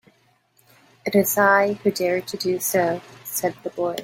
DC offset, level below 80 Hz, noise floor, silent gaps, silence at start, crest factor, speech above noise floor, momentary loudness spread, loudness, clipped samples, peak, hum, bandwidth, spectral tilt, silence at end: under 0.1%; -66 dBFS; -62 dBFS; none; 1.05 s; 20 dB; 41 dB; 11 LU; -21 LUFS; under 0.1%; -4 dBFS; none; 17 kHz; -4 dB/octave; 0 s